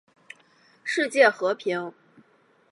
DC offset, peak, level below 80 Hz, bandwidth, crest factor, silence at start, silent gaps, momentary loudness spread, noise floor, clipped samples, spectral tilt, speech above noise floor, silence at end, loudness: under 0.1%; -4 dBFS; -86 dBFS; 11.5 kHz; 22 dB; 0.85 s; none; 16 LU; -62 dBFS; under 0.1%; -3.5 dB/octave; 39 dB; 0.8 s; -23 LUFS